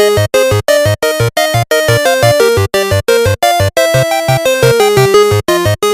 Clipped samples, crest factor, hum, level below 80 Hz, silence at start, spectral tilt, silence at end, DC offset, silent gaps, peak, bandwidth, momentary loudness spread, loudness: 0.2%; 10 dB; none; -36 dBFS; 0 s; -4 dB/octave; 0 s; under 0.1%; none; 0 dBFS; 16 kHz; 4 LU; -10 LUFS